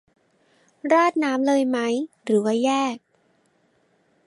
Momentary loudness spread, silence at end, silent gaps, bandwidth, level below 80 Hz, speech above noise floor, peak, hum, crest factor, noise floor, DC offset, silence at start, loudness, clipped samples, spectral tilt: 9 LU; 1.3 s; none; 11.5 kHz; -78 dBFS; 43 dB; -6 dBFS; none; 18 dB; -64 dBFS; under 0.1%; 0.85 s; -22 LUFS; under 0.1%; -4.5 dB/octave